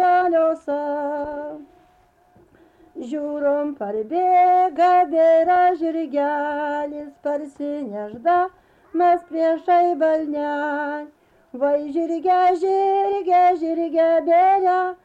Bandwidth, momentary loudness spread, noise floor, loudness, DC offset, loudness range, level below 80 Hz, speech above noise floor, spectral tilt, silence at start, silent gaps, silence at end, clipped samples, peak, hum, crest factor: 7.8 kHz; 13 LU; -57 dBFS; -20 LUFS; under 0.1%; 7 LU; -64 dBFS; 38 dB; -6 dB/octave; 0 s; none; 0.1 s; under 0.1%; -10 dBFS; none; 10 dB